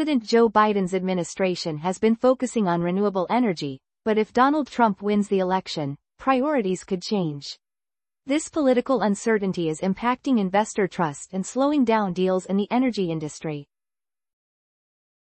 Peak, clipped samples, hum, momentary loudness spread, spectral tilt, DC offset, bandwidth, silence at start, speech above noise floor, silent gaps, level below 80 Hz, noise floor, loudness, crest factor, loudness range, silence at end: -6 dBFS; under 0.1%; none; 10 LU; -5.5 dB/octave; under 0.1%; 8.8 kHz; 0 s; over 67 dB; none; -62 dBFS; under -90 dBFS; -23 LUFS; 18 dB; 3 LU; 1.75 s